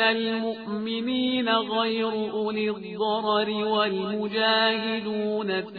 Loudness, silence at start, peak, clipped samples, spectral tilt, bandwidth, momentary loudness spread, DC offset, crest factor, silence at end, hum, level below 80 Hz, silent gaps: -25 LUFS; 0 s; -8 dBFS; under 0.1%; -7.5 dB/octave; 4.9 kHz; 7 LU; under 0.1%; 18 dB; 0 s; none; -70 dBFS; none